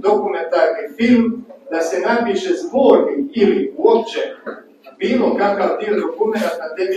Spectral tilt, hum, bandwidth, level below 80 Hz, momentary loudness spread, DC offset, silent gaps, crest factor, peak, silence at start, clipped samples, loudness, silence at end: -5.5 dB/octave; none; 13.5 kHz; -62 dBFS; 10 LU; under 0.1%; none; 16 dB; 0 dBFS; 0 s; under 0.1%; -17 LUFS; 0 s